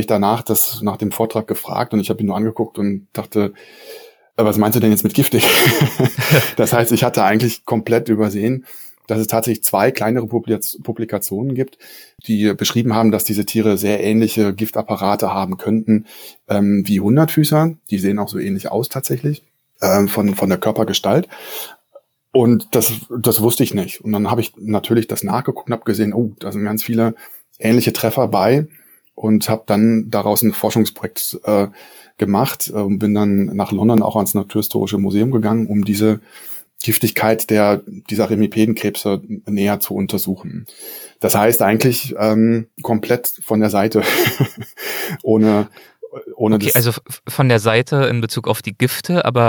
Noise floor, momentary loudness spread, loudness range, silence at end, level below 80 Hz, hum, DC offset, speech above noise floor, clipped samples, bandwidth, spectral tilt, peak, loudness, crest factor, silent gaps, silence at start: -49 dBFS; 9 LU; 4 LU; 0 s; -62 dBFS; none; under 0.1%; 32 dB; under 0.1%; over 20 kHz; -5 dB/octave; 0 dBFS; -17 LUFS; 16 dB; none; 0 s